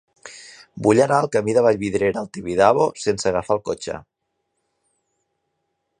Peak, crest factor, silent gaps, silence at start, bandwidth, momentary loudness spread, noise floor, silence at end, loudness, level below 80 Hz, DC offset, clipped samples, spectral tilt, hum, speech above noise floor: -2 dBFS; 20 dB; none; 0.25 s; 10.5 kHz; 22 LU; -75 dBFS; 2 s; -19 LUFS; -54 dBFS; under 0.1%; under 0.1%; -5.5 dB/octave; none; 56 dB